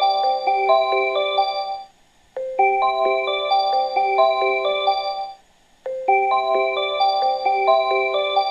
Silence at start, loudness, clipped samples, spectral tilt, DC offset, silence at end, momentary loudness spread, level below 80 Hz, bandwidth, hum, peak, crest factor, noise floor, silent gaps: 0 s; -19 LUFS; under 0.1%; -2.5 dB/octave; under 0.1%; 0 s; 11 LU; -64 dBFS; 7.4 kHz; none; -4 dBFS; 16 dB; -55 dBFS; none